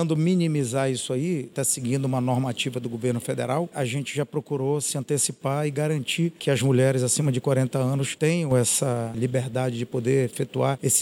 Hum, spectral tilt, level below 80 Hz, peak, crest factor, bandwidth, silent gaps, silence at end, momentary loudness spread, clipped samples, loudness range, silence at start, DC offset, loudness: none; -5 dB/octave; -64 dBFS; -8 dBFS; 16 dB; 16.5 kHz; none; 0 s; 6 LU; under 0.1%; 4 LU; 0 s; under 0.1%; -24 LUFS